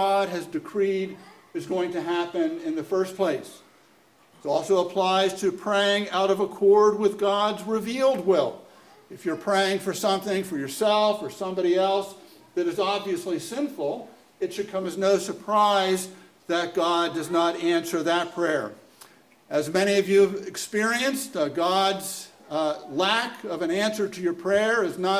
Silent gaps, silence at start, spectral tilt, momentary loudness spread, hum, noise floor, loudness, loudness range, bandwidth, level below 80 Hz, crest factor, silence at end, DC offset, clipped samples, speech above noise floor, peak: none; 0 s; -4 dB/octave; 10 LU; none; -58 dBFS; -25 LUFS; 5 LU; 16 kHz; -70 dBFS; 18 dB; 0 s; under 0.1%; under 0.1%; 34 dB; -6 dBFS